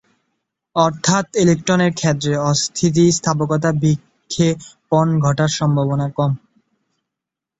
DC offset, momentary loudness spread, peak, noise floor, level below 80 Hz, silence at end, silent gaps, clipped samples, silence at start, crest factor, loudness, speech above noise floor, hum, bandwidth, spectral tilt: under 0.1%; 6 LU; -2 dBFS; -84 dBFS; -52 dBFS; 1.2 s; none; under 0.1%; 0.75 s; 16 dB; -17 LUFS; 68 dB; none; 8.2 kHz; -5.5 dB/octave